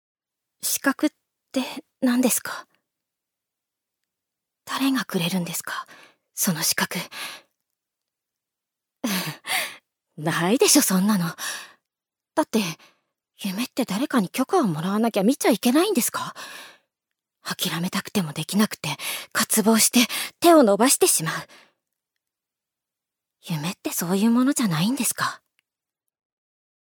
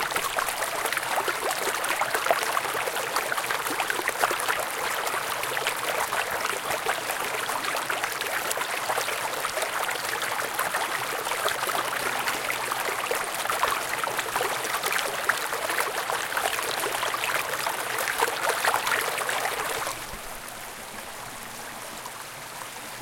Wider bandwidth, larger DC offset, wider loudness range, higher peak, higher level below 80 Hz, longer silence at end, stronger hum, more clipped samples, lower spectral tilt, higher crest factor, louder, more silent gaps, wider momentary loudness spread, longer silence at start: first, over 20 kHz vs 17 kHz; neither; first, 9 LU vs 2 LU; about the same, -4 dBFS vs -4 dBFS; second, -74 dBFS vs -60 dBFS; first, 1.65 s vs 0 s; neither; neither; first, -3.5 dB/octave vs -0.5 dB/octave; about the same, 22 dB vs 24 dB; first, -22 LUFS vs -27 LUFS; neither; first, 16 LU vs 11 LU; first, 0.65 s vs 0 s